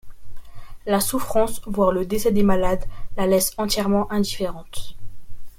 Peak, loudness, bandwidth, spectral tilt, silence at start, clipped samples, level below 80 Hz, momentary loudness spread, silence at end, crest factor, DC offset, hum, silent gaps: -6 dBFS; -22 LUFS; 16.5 kHz; -4.5 dB/octave; 0.05 s; under 0.1%; -36 dBFS; 16 LU; 0.1 s; 16 dB; under 0.1%; none; none